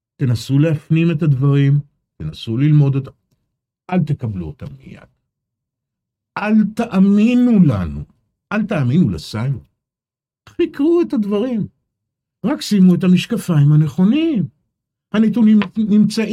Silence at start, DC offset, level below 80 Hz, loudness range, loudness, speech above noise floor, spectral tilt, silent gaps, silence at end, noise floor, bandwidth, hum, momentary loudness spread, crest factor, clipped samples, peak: 0.2 s; under 0.1%; -48 dBFS; 6 LU; -16 LUFS; over 75 dB; -8 dB/octave; none; 0 s; under -90 dBFS; 13 kHz; none; 15 LU; 14 dB; under 0.1%; -2 dBFS